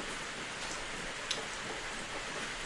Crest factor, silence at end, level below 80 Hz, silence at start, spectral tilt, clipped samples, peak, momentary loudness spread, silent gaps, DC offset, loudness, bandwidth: 24 dB; 0 s; -54 dBFS; 0 s; -1.5 dB/octave; under 0.1%; -16 dBFS; 3 LU; none; under 0.1%; -38 LUFS; 11.5 kHz